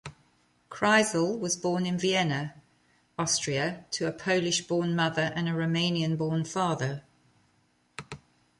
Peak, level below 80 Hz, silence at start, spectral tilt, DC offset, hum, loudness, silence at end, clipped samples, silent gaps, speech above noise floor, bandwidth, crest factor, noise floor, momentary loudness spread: -8 dBFS; -66 dBFS; 0.05 s; -4 dB/octave; under 0.1%; none; -28 LUFS; 0.45 s; under 0.1%; none; 41 dB; 11.5 kHz; 20 dB; -68 dBFS; 18 LU